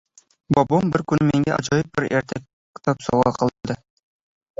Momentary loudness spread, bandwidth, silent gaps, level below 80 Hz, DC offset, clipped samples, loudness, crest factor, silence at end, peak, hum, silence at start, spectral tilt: 12 LU; 7.8 kHz; 2.53-2.74 s; -50 dBFS; under 0.1%; under 0.1%; -21 LUFS; 20 dB; 0.85 s; -2 dBFS; none; 0.5 s; -6.5 dB/octave